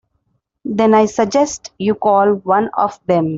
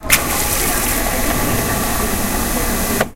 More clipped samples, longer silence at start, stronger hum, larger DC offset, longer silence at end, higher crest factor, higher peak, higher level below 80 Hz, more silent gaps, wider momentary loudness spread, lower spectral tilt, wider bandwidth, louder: neither; first, 0.65 s vs 0 s; neither; neither; about the same, 0 s vs 0 s; about the same, 14 dB vs 18 dB; about the same, -2 dBFS vs 0 dBFS; second, -56 dBFS vs -26 dBFS; neither; first, 8 LU vs 4 LU; first, -5.5 dB/octave vs -3 dB/octave; second, 7.8 kHz vs 17 kHz; about the same, -15 LUFS vs -17 LUFS